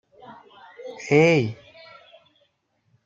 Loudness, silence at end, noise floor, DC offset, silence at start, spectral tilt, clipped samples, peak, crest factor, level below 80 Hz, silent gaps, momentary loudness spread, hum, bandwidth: -20 LUFS; 1.5 s; -69 dBFS; under 0.1%; 0.3 s; -6.5 dB/octave; under 0.1%; -4 dBFS; 22 dB; -68 dBFS; none; 24 LU; none; 7.8 kHz